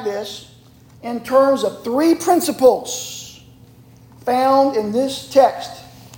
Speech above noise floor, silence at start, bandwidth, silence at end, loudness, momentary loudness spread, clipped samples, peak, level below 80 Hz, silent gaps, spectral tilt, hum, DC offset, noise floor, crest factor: 29 dB; 0 s; 17 kHz; 0 s; -17 LUFS; 18 LU; under 0.1%; -2 dBFS; -56 dBFS; none; -4 dB/octave; none; under 0.1%; -45 dBFS; 18 dB